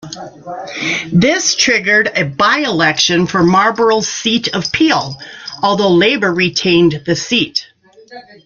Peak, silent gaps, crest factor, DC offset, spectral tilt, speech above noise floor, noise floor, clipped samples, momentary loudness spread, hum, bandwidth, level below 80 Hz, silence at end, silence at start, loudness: 0 dBFS; none; 14 dB; under 0.1%; -3.5 dB/octave; 24 dB; -37 dBFS; under 0.1%; 12 LU; none; 7.4 kHz; -48 dBFS; 0.25 s; 0.05 s; -12 LUFS